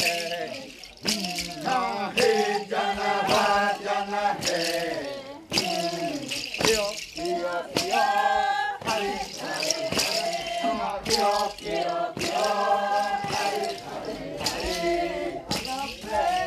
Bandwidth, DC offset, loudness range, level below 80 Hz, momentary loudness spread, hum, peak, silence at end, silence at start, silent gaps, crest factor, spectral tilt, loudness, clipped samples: 14.5 kHz; under 0.1%; 3 LU; -54 dBFS; 9 LU; none; -6 dBFS; 0 s; 0 s; none; 20 dB; -2.5 dB/octave; -26 LUFS; under 0.1%